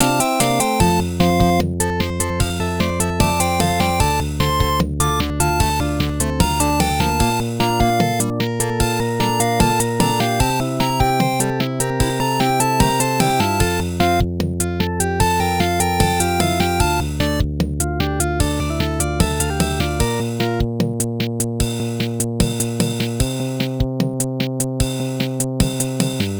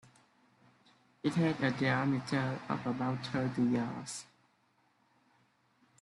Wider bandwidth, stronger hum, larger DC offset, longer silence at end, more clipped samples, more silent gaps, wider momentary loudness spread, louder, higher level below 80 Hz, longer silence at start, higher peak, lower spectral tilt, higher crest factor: first, over 20 kHz vs 11.5 kHz; neither; neither; second, 0 s vs 1.75 s; neither; neither; second, 5 LU vs 8 LU; first, -18 LUFS vs -34 LUFS; first, -28 dBFS vs -72 dBFS; second, 0 s vs 1.25 s; first, 0 dBFS vs -18 dBFS; second, -4.5 dB/octave vs -6 dB/octave; about the same, 18 dB vs 18 dB